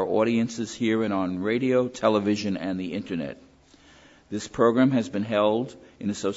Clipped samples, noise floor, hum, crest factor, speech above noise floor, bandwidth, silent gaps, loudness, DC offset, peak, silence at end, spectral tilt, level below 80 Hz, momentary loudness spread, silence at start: under 0.1%; -55 dBFS; none; 18 dB; 30 dB; 8 kHz; none; -25 LUFS; under 0.1%; -6 dBFS; 0 s; -6 dB/octave; -60 dBFS; 11 LU; 0 s